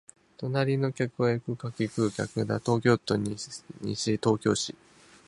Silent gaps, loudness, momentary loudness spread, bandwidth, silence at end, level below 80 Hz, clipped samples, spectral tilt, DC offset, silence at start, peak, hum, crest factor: none; -29 LUFS; 11 LU; 11.5 kHz; 0.55 s; -60 dBFS; under 0.1%; -5.5 dB/octave; under 0.1%; 0.4 s; -8 dBFS; none; 20 dB